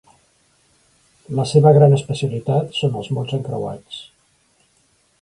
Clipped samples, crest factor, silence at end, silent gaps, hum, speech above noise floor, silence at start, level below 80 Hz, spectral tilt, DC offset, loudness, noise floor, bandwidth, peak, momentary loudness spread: under 0.1%; 18 dB; 1.2 s; none; none; 44 dB; 1.3 s; -56 dBFS; -7 dB/octave; under 0.1%; -18 LUFS; -61 dBFS; 11 kHz; 0 dBFS; 17 LU